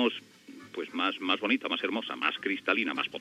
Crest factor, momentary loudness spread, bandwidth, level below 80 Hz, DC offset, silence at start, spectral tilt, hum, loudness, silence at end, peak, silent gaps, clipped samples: 20 dB; 13 LU; 13.5 kHz; -82 dBFS; under 0.1%; 0 s; -4 dB/octave; none; -30 LUFS; 0 s; -12 dBFS; none; under 0.1%